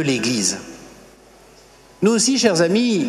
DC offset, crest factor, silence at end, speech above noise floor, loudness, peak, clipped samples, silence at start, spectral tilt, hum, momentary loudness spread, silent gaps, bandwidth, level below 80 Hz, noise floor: under 0.1%; 18 dB; 0 s; 30 dB; -17 LUFS; -2 dBFS; under 0.1%; 0 s; -3.5 dB/octave; none; 10 LU; none; 13.5 kHz; -58 dBFS; -47 dBFS